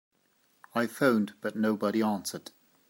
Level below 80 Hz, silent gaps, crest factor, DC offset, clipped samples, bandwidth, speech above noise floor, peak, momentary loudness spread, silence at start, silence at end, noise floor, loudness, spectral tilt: -80 dBFS; none; 20 dB; under 0.1%; under 0.1%; 16 kHz; 41 dB; -10 dBFS; 10 LU; 0.75 s; 0.5 s; -70 dBFS; -29 LUFS; -5.5 dB/octave